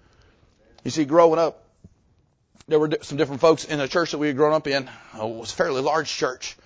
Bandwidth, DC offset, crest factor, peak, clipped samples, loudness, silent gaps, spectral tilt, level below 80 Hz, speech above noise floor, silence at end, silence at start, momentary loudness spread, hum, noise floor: 8 kHz; under 0.1%; 20 dB; -4 dBFS; under 0.1%; -22 LUFS; none; -4.5 dB/octave; -60 dBFS; 42 dB; 0.15 s; 0.85 s; 12 LU; none; -63 dBFS